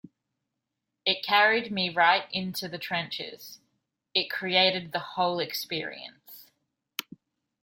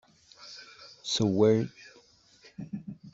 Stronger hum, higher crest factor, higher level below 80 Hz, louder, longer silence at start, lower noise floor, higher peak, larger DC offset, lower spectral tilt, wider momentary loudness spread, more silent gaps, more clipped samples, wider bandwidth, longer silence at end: neither; about the same, 22 dB vs 22 dB; second, -74 dBFS vs -68 dBFS; about the same, -26 LUFS vs -28 LUFS; first, 1.05 s vs 0.4 s; first, -84 dBFS vs -60 dBFS; about the same, -8 dBFS vs -10 dBFS; neither; second, -3.5 dB/octave vs -5.5 dB/octave; second, 16 LU vs 24 LU; neither; neither; first, 16.5 kHz vs 8 kHz; first, 0.6 s vs 0.05 s